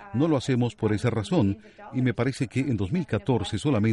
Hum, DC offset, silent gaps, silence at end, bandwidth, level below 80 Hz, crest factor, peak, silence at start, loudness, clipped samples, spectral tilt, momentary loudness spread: none; under 0.1%; none; 0 s; 11.5 kHz; -52 dBFS; 16 dB; -8 dBFS; 0 s; -26 LUFS; under 0.1%; -7 dB/octave; 4 LU